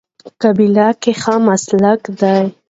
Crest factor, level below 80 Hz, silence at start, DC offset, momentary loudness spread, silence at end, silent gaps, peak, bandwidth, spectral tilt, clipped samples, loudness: 14 dB; -58 dBFS; 0.25 s; under 0.1%; 5 LU; 0.2 s; none; 0 dBFS; 8 kHz; -6 dB/octave; under 0.1%; -13 LUFS